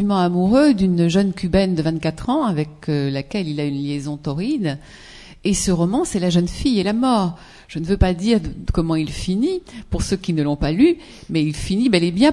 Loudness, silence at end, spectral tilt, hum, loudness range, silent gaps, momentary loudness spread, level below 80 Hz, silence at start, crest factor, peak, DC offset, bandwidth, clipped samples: -20 LUFS; 0 s; -6 dB/octave; none; 4 LU; none; 10 LU; -34 dBFS; 0 s; 18 dB; 0 dBFS; under 0.1%; 12 kHz; under 0.1%